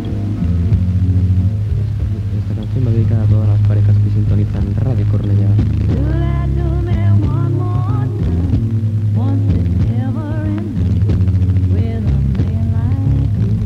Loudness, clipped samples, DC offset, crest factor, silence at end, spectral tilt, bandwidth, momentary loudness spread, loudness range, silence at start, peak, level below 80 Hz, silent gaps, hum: -15 LUFS; under 0.1%; under 0.1%; 12 dB; 0 s; -10 dB/octave; 4.8 kHz; 5 LU; 2 LU; 0 s; -2 dBFS; -24 dBFS; none; none